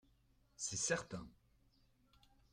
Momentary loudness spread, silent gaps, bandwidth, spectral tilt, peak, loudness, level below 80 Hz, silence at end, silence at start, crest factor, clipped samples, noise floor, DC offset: 15 LU; none; 16 kHz; -2.5 dB/octave; -24 dBFS; -42 LUFS; -70 dBFS; 1.2 s; 0.6 s; 24 dB; under 0.1%; -74 dBFS; under 0.1%